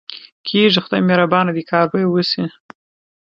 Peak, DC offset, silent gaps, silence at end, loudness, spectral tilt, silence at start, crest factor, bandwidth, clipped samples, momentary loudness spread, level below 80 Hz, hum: 0 dBFS; under 0.1%; 0.32-0.44 s; 0.75 s; -16 LUFS; -7 dB/octave; 0.1 s; 18 dB; 7 kHz; under 0.1%; 11 LU; -64 dBFS; none